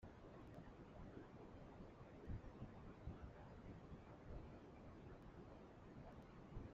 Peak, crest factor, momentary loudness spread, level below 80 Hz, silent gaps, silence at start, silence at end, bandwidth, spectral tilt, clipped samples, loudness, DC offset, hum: -40 dBFS; 18 dB; 5 LU; -64 dBFS; none; 0 s; 0 s; 7.4 kHz; -7.5 dB/octave; under 0.1%; -60 LUFS; under 0.1%; none